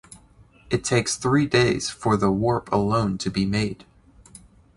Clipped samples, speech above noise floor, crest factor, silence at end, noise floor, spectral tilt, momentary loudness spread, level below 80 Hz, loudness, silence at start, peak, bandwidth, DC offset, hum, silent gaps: under 0.1%; 31 dB; 18 dB; 1.05 s; -53 dBFS; -5 dB/octave; 7 LU; -46 dBFS; -22 LUFS; 0.1 s; -6 dBFS; 11.5 kHz; under 0.1%; none; none